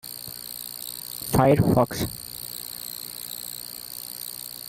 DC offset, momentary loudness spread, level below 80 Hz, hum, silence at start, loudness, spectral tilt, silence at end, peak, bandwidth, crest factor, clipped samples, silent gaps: under 0.1%; 15 LU; -48 dBFS; none; 0.05 s; -27 LUFS; -5 dB/octave; 0 s; -8 dBFS; 17 kHz; 20 dB; under 0.1%; none